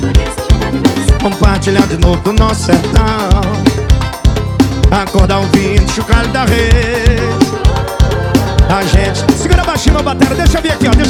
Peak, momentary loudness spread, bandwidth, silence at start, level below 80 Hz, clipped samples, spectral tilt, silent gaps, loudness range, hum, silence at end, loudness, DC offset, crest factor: 0 dBFS; 3 LU; 16 kHz; 0 s; -14 dBFS; 0.2%; -5.5 dB/octave; none; 1 LU; none; 0 s; -11 LUFS; under 0.1%; 10 dB